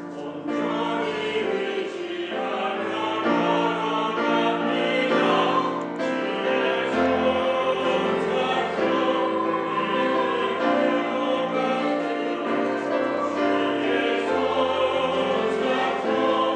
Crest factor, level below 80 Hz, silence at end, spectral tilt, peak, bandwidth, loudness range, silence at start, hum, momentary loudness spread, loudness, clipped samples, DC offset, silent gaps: 14 dB; -64 dBFS; 0 s; -5 dB/octave; -8 dBFS; 9.4 kHz; 2 LU; 0 s; none; 5 LU; -23 LUFS; under 0.1%; under 0.1%; none